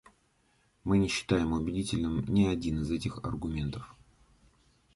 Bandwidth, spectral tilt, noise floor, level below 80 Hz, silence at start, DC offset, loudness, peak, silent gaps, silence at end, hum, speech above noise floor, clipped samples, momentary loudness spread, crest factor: 11.5 kHz; -6 dB/octave; -70 dBFS; -46 dBFS; 0.85 s; under 0.1%; -31 LUFS; -12 dBFS; none; 1.05 s; none; 40 dB; under 0.1%; 10 LU; 20 dB